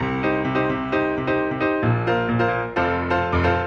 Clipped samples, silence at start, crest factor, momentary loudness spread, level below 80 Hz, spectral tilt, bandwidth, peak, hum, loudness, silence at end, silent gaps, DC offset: under 0.1%; 0 s; 14 dB; 2 LU; -44 dBFS; -8 dB/octave; 7.2 kHz; -8 dBFS; none; -21 LUFS; 0 s; none; under 0.1%